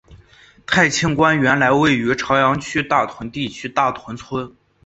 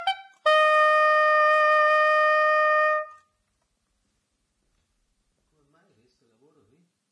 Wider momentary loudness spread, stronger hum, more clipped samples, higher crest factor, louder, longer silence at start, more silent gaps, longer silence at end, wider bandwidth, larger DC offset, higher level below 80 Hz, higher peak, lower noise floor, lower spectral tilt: first, 13 LU vs 8 LU; neither; neither; about the same, 18 dB vs 14 dB; first, -17 LUFS vs -20 LUFS; about the same, 0.1 s vs 0 s; neither; second, 0.35 s vs 4.05 s; second, 8.2 kHz vs 9.8 kHz; neither; first, -48 dBFS vs -80 dBFS; first, -2 dBFS vs -10 dBFS; second, -49 dBFS vs -75 dBFS; first, -4.5 dB/octave vs 1 dB/octave